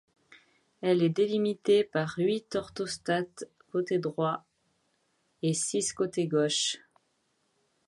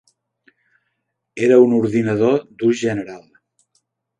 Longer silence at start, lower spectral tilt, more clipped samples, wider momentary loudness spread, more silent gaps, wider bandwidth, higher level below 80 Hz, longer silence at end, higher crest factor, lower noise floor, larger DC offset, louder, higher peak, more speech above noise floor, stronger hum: second, 0.8 s vs 1.35 s; second, -4.5 dB/octave vs -7 dB/octave; neither; second, 10 LU vs 15 LU; neither; first, 11.5 kHz vs 9.2 kHz; second, -70 dBFS vs -62 dBFS; about the same, 1.1 s vs 1 s; about the same, 16 dB vs 18 dB; about the same, -74 dBFS vs -74 dBFS; neither; second, -29 LUFS vs -17 LUFS; second, -14 dBFS vs -2 dBFS; second, 46 dB vs 58 dB; neither